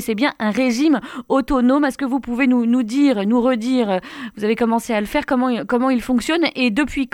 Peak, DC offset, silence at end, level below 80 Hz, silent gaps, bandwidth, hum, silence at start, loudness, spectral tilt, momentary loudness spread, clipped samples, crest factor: -4 dBFS; under 0.1%; 0.05 s; -44 dBFS; none; 15.5 kHz; none; 0 s; -18 LUFS; -5 dB/octave; 5 LU; under 0.1%; 14 dB